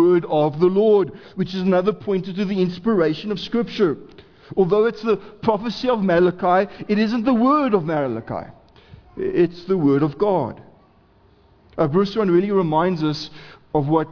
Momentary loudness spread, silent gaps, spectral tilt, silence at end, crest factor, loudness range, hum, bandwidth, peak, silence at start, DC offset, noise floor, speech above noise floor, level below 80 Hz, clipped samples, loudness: 10 LU; none; -8 dB/octave; 0 s; 16 dB; 3 LU; none; 5.4 kHz; -4 dBFS; 0 s; under 0.1%; -54 dBFS; 35 dB; -52 dBFS; under 0.1%; -20 LUFS